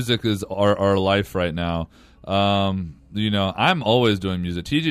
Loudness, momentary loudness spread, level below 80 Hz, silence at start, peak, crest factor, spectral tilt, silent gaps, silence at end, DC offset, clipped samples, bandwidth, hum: -21 LUFS; 8 LU; -46 dBFS; 0 s; -6 dBFS; 16 dB; -6 dB/octave; none; 0 s; under 0.1%; under 0.1%; 15 kHz; none